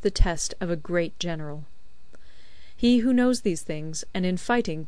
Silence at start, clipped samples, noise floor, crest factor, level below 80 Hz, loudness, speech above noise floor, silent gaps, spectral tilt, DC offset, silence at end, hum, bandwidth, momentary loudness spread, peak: 0 s; under 0.1%; -52 dBFS; 20 dB; -34 dBFS; -26 LUFS; 28 dB; none; -5 dB/octave; 2%; 0 s; none; 11 kHz; 11 LU; -4 dBFS